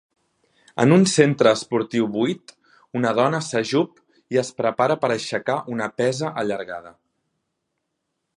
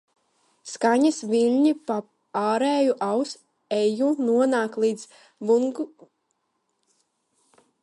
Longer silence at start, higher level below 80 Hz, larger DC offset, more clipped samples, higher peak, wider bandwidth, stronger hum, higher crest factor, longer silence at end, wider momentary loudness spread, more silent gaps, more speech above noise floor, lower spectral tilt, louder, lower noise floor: about the same, 0.75 s vs 0.65 s; first, -66 dBFS vs -78 dBFS; neither; neither; first, -2 dBFS vs -8 dBFS; about the same, 11.5 kHz vs 11.5 kHz; neither; about the same, 20 dB vs 16 dB; second, 1.5 s vs 1.95 s; about the same, 13 LU vs 14 LU; neither; first, 57 dB vs 52 dB; about the same, -5.5 dB/octave vs -4.5 dB/octave; about the same, -21 LUFS vs -23 LUFS; about the same, -77 dBFS vs -75 dBFS